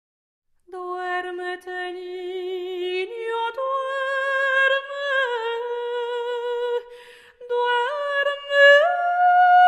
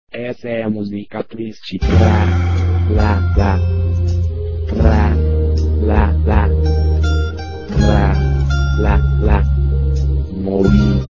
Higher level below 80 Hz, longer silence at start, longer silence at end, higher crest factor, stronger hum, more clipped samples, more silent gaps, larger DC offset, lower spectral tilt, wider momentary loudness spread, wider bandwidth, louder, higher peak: second, -72 dBFS vs -16 dBFS; first, 0.7 s vs 0.15 s; about the same, 0 s vs 0.05 s; about the same, 18 dB vs 14 dB; neither; neither; neither; second, under 0.1% vs 1%; second, -1 dB/octave vs -8.5 dB/octave; first, 15 LU vs 10 LU; first, 10.5 kHz vs 7.2 kHz; second, -22 LUFS vs -16 LUFS; second, -4 dBFS vs 0 dBFS